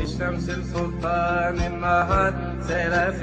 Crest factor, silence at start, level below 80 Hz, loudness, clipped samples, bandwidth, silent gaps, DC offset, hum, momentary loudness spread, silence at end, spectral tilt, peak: 16 dB; 0 s; -34 dBFS; -24 LUFS; under 0.1%; 9.2 kHz; none; under 0.1%; none; 7 LU; 0 s; -6.5 dB/octave; -8 dBFS